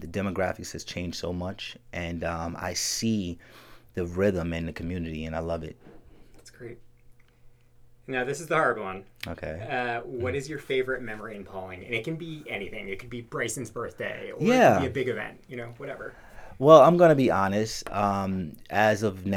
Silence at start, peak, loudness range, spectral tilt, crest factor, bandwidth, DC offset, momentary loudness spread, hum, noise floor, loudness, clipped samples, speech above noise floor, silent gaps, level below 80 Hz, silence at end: 0 s; -2 dBFS; 13 LU; -5 dB/octave; 26 dB; 16.5 kHz; under 0.1%; 19 LU; none; -54 dBFS; -26 LUFS; under 0.1%; 28 dB; none; -52 dBFS; 0 s